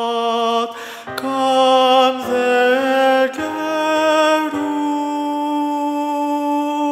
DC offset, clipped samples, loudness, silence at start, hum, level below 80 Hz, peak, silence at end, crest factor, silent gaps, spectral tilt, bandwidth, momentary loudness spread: under 0.1%; under 0.1%; -17 LUFS; 0 s; none; -64 dBFS; -2 dBFS; 0 s; 14 dB; none; -3 dB/octave; 16 kHz; 8 LU